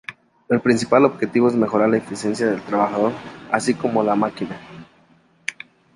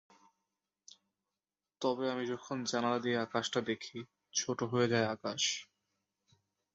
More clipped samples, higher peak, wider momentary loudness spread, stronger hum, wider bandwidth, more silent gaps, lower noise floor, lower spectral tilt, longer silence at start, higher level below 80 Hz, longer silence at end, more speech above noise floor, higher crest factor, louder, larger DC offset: neither; first, -2 dBFS vs -16 dBFS; first, 14 LU vs 8 LU; neither; first, 11.5 kHz vs 7.6 kHz; neither; second, -56 dBFS vs under -90 dBFS; first, -6 dB/octave vs -3.5 dB/octave; second, 0.1 s vs 1.8 s; first, -60 dBFS vs -76 dBFS; second, 0.45 s vs 1.1 s; second, 37 dB vs over 55 dB; about the same, 18 dB vs 20 dB; first, -20 LUFS vs -35 LUFS; neither